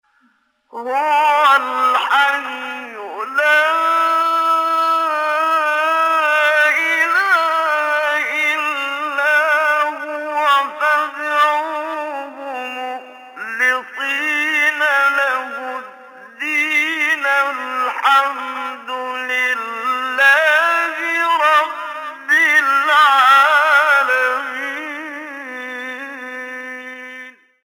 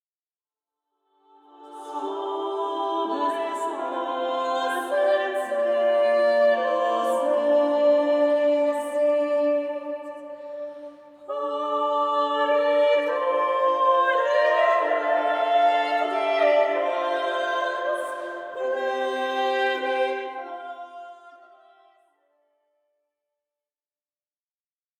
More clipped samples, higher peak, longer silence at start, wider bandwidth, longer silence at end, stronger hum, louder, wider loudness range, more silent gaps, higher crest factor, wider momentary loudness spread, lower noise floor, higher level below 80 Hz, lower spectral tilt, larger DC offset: neither; first, -2 dBFS vs -10 dBFS; second, 0.75 s vs 1.6 s; first, 19 kHz vs 12.5 kHz; second, 0.35 s vs 3.65 s; neither; first, -15 LUFS vs -23 LUFS; about the same, 6 LU vs 8 LU; neither; about the same, 16 dB vs 16 dB; about the same, 16 LU vs 15 LU; second, -60 dBFS vs under -90 dBFS; first, -72 dBFS vs -84 dBFS; second, 0 dB/octave vs -2.5 dB/octave; neither